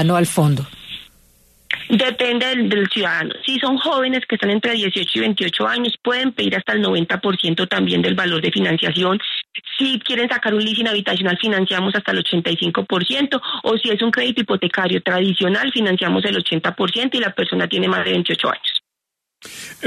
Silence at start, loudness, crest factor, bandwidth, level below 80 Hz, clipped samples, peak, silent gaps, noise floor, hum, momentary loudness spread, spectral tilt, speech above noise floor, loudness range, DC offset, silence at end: 0 s; -18 LUFS; 16 dB; 13.5 kHz; -60 dBFS; under 0.1%; -4 dBFS; none; -81 dBFS; none; 3 LU; -5 dB/octave; 63 dB; 1 LU; under 0.1%; 0 s